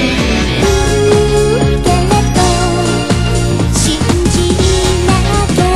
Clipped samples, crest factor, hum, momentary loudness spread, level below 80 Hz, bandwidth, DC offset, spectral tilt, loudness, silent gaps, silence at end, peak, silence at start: under 0.1%; 10 dB; none; 3 LU; -18 dBFS; 16 kHz; 2%; -5 dB/octave; -11 LUFS; none; 0 s; 0 dBFS; 0 s